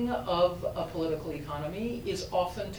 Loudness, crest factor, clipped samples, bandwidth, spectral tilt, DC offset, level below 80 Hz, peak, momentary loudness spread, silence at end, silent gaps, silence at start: -32 LUFS; 18 dB; under 0.1%; over 20 kHz; -5.5 dB/octave; under 0.1%; -50 dBFS; -14 dBFS; 8 LU; 0 s; none; 0 s